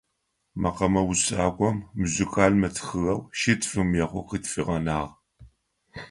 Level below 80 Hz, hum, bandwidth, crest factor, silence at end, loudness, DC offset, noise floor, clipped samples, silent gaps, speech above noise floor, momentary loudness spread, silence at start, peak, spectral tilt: -44 dBFS; none; 11.5 kHz; 22 dB; 0 s; -25 LUFS; under 0.1%; -76 dBFS; under 0.1%; none; 51 dB; 9 LU; 0.55 s; -4 dBFS; -5 dB/octave